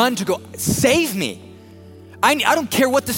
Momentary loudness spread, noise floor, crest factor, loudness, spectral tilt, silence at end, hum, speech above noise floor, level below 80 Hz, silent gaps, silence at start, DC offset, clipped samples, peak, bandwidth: 9 LU; -41 dBFS; 18 dB; -18 LUFS; -3.5 dB/octave; 0 s; none; 23 dB; -50 dBFS; none; 0 s; under 0.1%; under 0.1%; -2 dBFS; 17 kHz